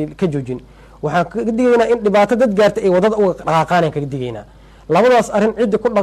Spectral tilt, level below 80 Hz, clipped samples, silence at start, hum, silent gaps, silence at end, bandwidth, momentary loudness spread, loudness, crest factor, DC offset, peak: -6.5 dB/octave; -44 dBFS; under 0.1%; 0 s; none; none; 0 s; 13 kHz; 12 LU; -15 LUFS; 12 dB; under 0.1%; -4 dBFS